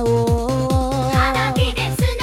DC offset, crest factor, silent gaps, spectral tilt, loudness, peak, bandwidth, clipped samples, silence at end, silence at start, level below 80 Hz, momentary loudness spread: under 0.1%; 12 dB; none; -5.5 dB/octave; -18 LUFS; -6 dBFS; 16.5 kHz; under 0.1%; 0 s; 0 s; -28 dBFS; 3 LU